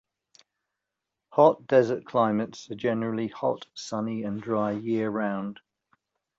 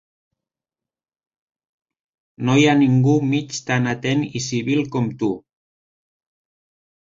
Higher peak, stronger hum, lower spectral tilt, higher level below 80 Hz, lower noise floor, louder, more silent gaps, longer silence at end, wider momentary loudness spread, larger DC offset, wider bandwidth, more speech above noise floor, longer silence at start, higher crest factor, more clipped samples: about the same, -6 dBFS vs -4 dBFS; neither; about the same, -6.5 dB/octave vs -6 dB/octave; second, -70 dBFS vs -58 dBFS; second, -86 dBFS vs under -90 dBFS; second, -27 LUFS vs -19 LUFS; neither; second, 0.85 s vs 1.65 s; about the same, 12 LU vs 10 LU; neither; about the same, 7.8 kHz vs 7.8 kHz; second, 60 dB vs over 72 dB; second, 1.3 s vs 2.4 s; about the same, 22 dB vs 18 dB; neither